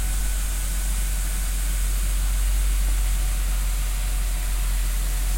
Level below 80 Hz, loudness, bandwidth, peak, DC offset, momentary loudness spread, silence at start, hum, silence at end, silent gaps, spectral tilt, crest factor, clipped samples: -22 dBFS; -26 LUFS; 16.5 kHz; -14 dBFS; under 0.1%; 2 LU; 0 s; none; 0 s; none; -3 dB/octave; 8 dB; under 0.1%